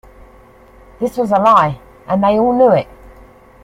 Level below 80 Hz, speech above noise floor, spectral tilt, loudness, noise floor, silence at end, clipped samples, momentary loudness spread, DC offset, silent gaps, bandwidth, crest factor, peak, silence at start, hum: -44 dBFS; 31 dB; -7.5 dB/octave; -14 LUFS; -43 dBFS; 0.8 s; under 0.1%; 12 LU; under 0.1%; none; 15.5 kHz; 16 dB; 0 dBFS; 1 s; none